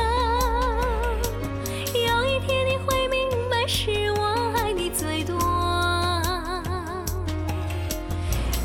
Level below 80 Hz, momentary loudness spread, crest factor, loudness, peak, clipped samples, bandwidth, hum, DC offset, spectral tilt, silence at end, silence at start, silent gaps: -32 dBFS; 7 LU; 14 dB; -25 LUFS; -10 dBFS; under 0.1%; 17.5 kHz; none; under 0.1%; -4.5 dB/octave; 0 s; 0 s; none